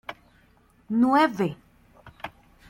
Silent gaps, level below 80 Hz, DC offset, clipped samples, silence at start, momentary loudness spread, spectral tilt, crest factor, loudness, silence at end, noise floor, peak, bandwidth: none; -62 dBFS; under 0.1%; under 0.1%; 0.1 s; 22 LU; -6.5 dB/octave; 18 dB; -23 LUFS; 0.4 s; -60 dBFS; -8 dBFS; 16 kHz